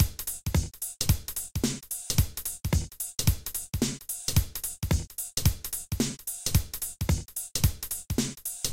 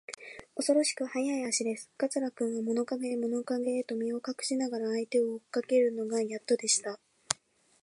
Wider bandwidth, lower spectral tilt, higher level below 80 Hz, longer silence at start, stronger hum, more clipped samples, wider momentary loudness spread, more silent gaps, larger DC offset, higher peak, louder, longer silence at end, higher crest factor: first, 17 kHz vs 11.5 kHz; first, -4 dB/octave vs -2.5 dB/octave; first, -36 dBFS vs -78 dBFS; about the same, 0 s vs 0.1 s; neither; neither; about the same, 6 LU vs 8 LU; neither; neither; second, -10 dBFS vs -4 dBFS; about the same, -30 LUFS vs -31 LUFS; second, 0 s vs 0.5 s; second, 20 dB vs 28 dB